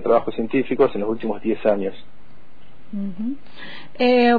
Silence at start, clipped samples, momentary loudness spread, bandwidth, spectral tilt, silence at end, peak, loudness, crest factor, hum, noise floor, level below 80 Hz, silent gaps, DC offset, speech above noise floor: 0 s; under 0.1%; 16 LU; 5 kHz; -8 dB/octave; 0 s; -4 dBFS; -22 LUFS; 16 dB; none; -50 dBFS; -54 dBFS; none; 4%; 29 dB